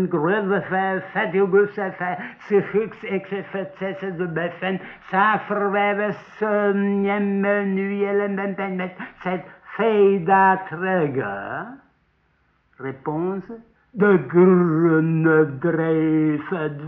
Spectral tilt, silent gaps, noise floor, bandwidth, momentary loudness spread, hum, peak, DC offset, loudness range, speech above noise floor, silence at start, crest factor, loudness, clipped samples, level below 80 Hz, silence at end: -6.5 dB/octave; none; -64 dBFS; 4.1 kHz; 14 LU; none; -6 dBFS; under 0.1%; 6 LU; 43 dB; 0 s; 16 dB; -21 LUFS; under 0.1%; -64 dBFS; 0 s